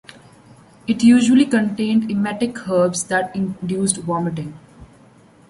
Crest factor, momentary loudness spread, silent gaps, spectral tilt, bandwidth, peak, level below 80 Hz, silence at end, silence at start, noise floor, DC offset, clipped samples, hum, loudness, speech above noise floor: 16 dB; 12 LU; none; -5 dB/octave; 11.5 kHz; -4 dBFS; -56 dBFS; 0.65 s; 0.85 s; -49 dBFS; under 0.1%; under 0.1%; none; -18 LUFS; 31 dB